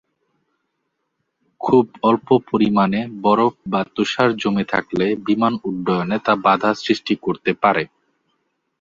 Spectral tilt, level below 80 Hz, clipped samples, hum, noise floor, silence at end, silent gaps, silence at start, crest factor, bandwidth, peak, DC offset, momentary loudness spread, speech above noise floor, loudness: -6.5 dB/octave; -58 dBFS; under 0.1%; none; -74 dBFS; 0.95 s; none; 1.6 s; 18 dB; 7.6 kHz; 0 dBFS; under 0.1%; 6 LU; 56 dB; -19 LUFS